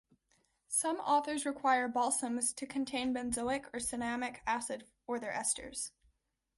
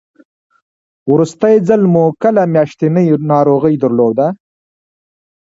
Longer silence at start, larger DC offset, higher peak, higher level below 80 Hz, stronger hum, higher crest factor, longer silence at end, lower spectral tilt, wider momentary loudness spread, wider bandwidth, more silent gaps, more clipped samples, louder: second, 0.7 s vs 1.05 s; neither; second, -18 dBFS vs 0 dBFS; second, -66 dBFS vs -56 dBFS; neither; first, 18 dB vs 12 dB; second, 0.7 s vs 1.15 s; second, -2 dB/octave vs -9 dB/octave; first, 9 LU vs 5 LU; first, 12 kHz vs 7.8 kHz; neither; neither; second, -35 LUFS vs -12 LUFS